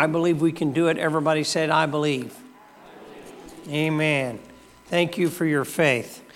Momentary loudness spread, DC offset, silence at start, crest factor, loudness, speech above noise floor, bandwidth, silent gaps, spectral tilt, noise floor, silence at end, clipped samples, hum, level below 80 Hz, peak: 20 LU; under 0.1%; 0 s; 18 dB; -23 LUFS; 25 dB; 16.5 kHz; none; -5.5 dB/octave; -48 dBFS; 0.15 s; under 0.1%; none; -64 dBFS; -6 dBFS